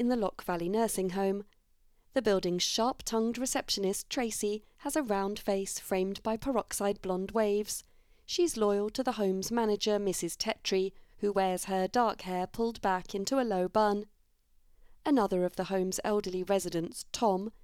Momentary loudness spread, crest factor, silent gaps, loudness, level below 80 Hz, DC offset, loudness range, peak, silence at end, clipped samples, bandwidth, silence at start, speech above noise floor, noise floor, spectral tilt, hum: 6 LU; 16 dB; none; -32 LUFS; -58 dBFS; under 0.1%; 2 LU; -14 dBFS; 0.15 s; under 0.1%; 17.5 kHz; 0 s; 35 dB; -66 dBFS; -4 dB/octave; none